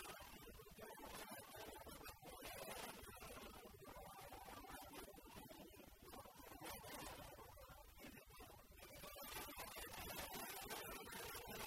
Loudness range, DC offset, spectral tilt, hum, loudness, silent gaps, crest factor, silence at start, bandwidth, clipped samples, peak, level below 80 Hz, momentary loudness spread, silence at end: 5 LU; under 0.1%; -2.5 dB/octave; none; -55 LUFS; none; 20 dB; 0 s; 16 kHz; under 0.1%; -36 dBFS; -68 dBFS; 10 LU; 0 s